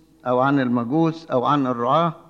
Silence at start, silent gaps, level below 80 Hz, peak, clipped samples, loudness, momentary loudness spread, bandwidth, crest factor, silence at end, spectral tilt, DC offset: 0.25 s; none; -66 dBFS; -6 dBFS; under 0.1%; -20 LUFS; 3 LU; 7 kHz; 14 dB; 0.1 s; -8 dB/octave; under 0.1%